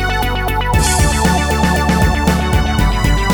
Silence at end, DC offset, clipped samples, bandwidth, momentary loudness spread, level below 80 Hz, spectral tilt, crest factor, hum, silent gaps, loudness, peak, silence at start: 0 s; 0.3%; under 0.1%; 19.5 kHz; 4 LU; -18 dBFS; -4.5 dB/octave; 14 dB; none; none; -14 LUFS; 0 dBFS; 0 s